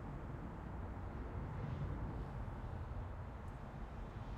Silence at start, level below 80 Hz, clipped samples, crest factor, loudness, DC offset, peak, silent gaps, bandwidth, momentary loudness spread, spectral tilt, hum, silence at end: 0 s; -50 dBFS; under 0.1%; 14 dB; -48 LUFS; under 0.1%; -32 dBFS; none; 8.8 kHz; 6 LU; -8.5 dB/octave; none; 0 s